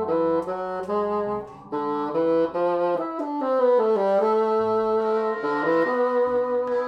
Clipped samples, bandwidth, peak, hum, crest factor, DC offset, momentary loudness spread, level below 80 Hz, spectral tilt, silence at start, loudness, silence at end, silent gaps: under 0.1%; 6.2 kHz; -10 dBFS; none; 12 dB; under 0.1%; 8 LU; -62 dBFS; -7.5 dB/octave; 0 s; -23 LUFS; 0 s; none